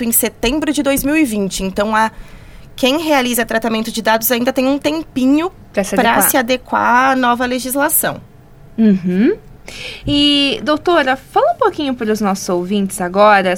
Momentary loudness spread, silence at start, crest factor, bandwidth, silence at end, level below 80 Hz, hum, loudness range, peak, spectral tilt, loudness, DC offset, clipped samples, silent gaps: 7 LU; 0 s; 14 dB; 19 kHz; 0 s; -40 dBFS; none; 2 LU; 0 dBFS; -3.5 dB/octave; -14 LUFS; under 0.1%; under 0.1%; none